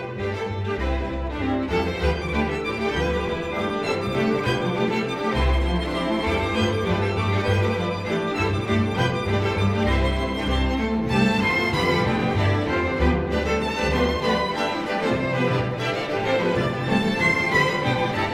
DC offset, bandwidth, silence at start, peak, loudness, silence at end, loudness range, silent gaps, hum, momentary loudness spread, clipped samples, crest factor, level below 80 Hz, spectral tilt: under 0.1%; 14.5 kHz; 0 s; -6 dBFS; -23 LUFS; 0 s; 2 LU; none; none; 5 LU; under 0.1%; 16 dB; -32 dBFS; -6 dB/octave